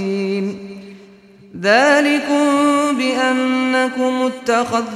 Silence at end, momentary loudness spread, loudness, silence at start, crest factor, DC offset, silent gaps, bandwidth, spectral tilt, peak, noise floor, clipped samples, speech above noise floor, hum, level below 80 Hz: 0 s; 10 LU; -16 LUFS; 0 s; 14 dB; under 0.1%; none; 14 kHz; -4 dB/octave; -2 dBFS; -44 dBFS; under 0.1%; 29 dB; none; -62 dBFS